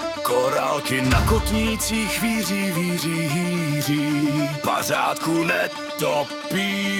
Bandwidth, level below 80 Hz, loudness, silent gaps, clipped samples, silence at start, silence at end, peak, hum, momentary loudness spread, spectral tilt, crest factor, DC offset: 18 kHz; -36 dBFS; -22 LUFS; none; under 0.1%; 0 s; 0 s; -6 dBFS; none; 3 LU; -4.5 dB/octave; 16 dB; under 0.1%